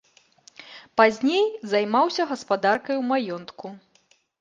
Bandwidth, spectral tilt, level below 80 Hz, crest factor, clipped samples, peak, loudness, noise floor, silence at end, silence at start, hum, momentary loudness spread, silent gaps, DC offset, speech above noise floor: 9.4 kHz; -4.5 dB/octave; -72 dBFS; 22 dB; under 0.1%; -2 dBFS; -23 LUFS; -63 dBFS; 0.65 s; 0.6 s; none; 20 LU; none; under 0.1%; 40 dB